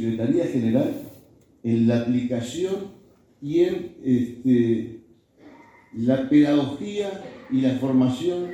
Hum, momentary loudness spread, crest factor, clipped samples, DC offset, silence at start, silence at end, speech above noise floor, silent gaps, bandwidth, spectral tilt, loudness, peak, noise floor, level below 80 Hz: none; 13 LU; 16 dB; under 0.1%; under 0.1%; 0 s; 0 s; 30 dB; none; 19 kHz; -7.5 dB/octave; -23 LUFS; -8 dBFS; -52 dBFS; -60 dBFS